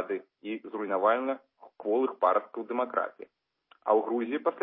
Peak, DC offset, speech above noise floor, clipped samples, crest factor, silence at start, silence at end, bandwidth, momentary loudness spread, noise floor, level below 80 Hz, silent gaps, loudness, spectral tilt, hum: -12 dBFS; under 0.1%; 36 dB; under 0.1%; 20 dB; 0 s; 0 s; 3.9 kHz; 12 LU; -65 dBFS; -90 dBFS; none; -30 LUFS; -8.5 dB/octave; none